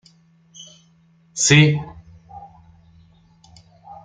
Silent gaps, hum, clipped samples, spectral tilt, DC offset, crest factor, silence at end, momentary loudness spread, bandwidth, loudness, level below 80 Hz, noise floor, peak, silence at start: none; none; under 0.1%; -4 dB/octave; under 0.1%; 22 dB; 0.1 s; 29 LU; 9.6 kHz; -15 LUFS; -54 dBFS; -56 dBFS; -2 dBFS; 1.35 s